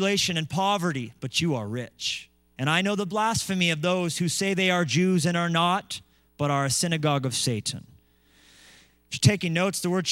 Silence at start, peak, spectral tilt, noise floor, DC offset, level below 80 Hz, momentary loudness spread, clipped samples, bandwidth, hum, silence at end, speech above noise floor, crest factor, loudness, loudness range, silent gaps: 0 s; -6 dBFS; -4 dB/octave; -60 dBFS; under 0.1%; -62 dBFS; 8 LU; under 0.1%; 16 kHz; none; 0 s; 35 dB; 20 dB; -25 LUFS; 3 LU; none